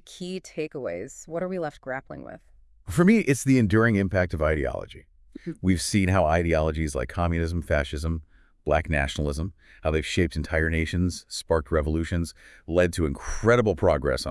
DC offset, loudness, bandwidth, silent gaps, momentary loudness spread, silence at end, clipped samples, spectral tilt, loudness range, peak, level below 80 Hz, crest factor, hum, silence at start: under 0.1%; -25 LUFS; 12 kHz; none; 14 LU; 0 s; under 0.1%; -6 dB/octave; 4 LU; -6 dBFS; -38 dBFS; 20 dB; none; 0.05 s